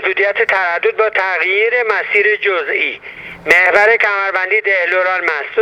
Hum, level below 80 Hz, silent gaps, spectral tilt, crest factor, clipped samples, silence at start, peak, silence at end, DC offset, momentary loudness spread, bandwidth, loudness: none; -58 dBFS; none; -2.5 dB/octave; 14 dB; under 0.1%; 0 s; 0 dBFS; 0 s; under 0.1%; 7 LU; 14.5 kHz; -13 LUFS